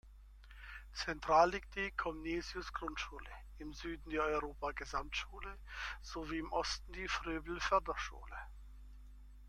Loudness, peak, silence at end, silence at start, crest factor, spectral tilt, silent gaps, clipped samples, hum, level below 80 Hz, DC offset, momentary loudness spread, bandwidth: -39 LUFS; -16 dBFS; 0 s; 0.05 s; 24 dB; -4 dB/octave; none; under 0.1%; none; -52 dBFS; under 0.1%; 20 LU; 14 kHz